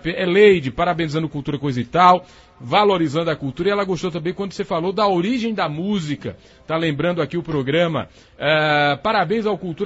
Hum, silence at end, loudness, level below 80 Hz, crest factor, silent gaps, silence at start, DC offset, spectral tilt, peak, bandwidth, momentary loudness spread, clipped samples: none; 0 s; -19 LUFS; -48 dBFS; 20 dB; none; 0.05 s; under 0.1%; -6.5 dB/octave; 0 dBFS; 8 kHz; 11 LU; under 0.1%